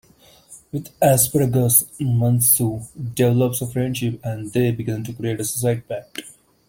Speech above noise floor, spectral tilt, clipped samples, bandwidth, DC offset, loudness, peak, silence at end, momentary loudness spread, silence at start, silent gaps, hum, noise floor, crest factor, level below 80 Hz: 30 dB; -5 dB/octave; under 0.1%; 17 kHz; under 0.1%; -19 LUFS; 0 dBFS; 0.35 s; 15 LU; 0.5 s; none; none; -50 dBFS; 20 dB; -52 dBFS